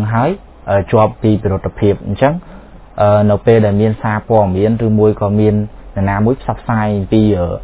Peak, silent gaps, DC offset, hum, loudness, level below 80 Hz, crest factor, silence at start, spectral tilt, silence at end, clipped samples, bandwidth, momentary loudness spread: 0 dBFS; none; under 0.1%; none; -14 LUFS; -32 dBFS; 14 dB; 0 s; -12.5 dB/octave; 0 s; under 0.1%; 4 kHz; 8 LU